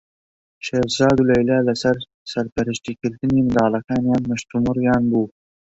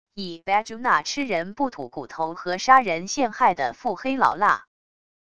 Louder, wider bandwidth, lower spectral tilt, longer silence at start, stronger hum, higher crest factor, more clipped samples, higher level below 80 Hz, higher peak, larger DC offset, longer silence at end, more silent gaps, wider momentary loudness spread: first, -20 LUFS vs -23 LUFS; second, 8 kHz vs 10 kHz; first, -6 dB/octave vs -3.5 dB/octave; first, 0.65 s vs 0.15 s; neither; second, 16 dB vs 22 dB; neither; first, -46 dBFS vs -60 dBFS; about the same, -2 dBFS vs -2 dBFS; second, under 0.1% vs 0.5%; second, 0.5 s vs 0.75 s; first, 2.14-2.25 s, 2.52-2.56 s vs none; about the same, 10 LU vs 12 LU